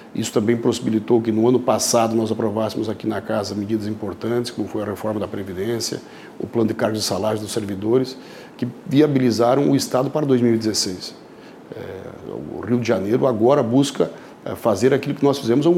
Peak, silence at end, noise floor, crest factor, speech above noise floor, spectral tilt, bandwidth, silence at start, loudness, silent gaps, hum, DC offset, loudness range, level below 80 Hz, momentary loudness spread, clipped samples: -4 dBFS; 0 s; -41 dBFS; 16 dB; 22 dB; -5.5 dB/octave; 16 kHz; 0 s; -20 LUFS; none; none; under 0.1%; 5 LU; -60 dBFS; 15 LU; under 0.1%